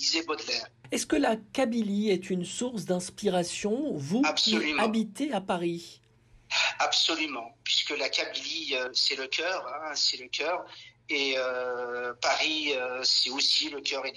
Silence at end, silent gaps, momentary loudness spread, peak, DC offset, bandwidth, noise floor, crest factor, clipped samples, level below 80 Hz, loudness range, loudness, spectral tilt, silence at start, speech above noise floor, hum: 0 s; none; 9 LU; -14 dBFS; under 0.1%; 13 kHz; -50 dBFS; 16 dB; under 0.1%; -66 dBFS; 2 LU; -28 LUFS; -2.5 dB/octave; 0 s; 21 dB; none